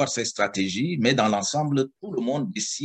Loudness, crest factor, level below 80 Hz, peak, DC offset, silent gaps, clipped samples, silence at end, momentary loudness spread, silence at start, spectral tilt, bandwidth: -24 LUFS; 20 dB; -68 dBFS; -6 dBFS; under 0.1%; none; under 0.1%; 0 s; 6 LU; 0 s; -4 dB/octave; 9.6 kHz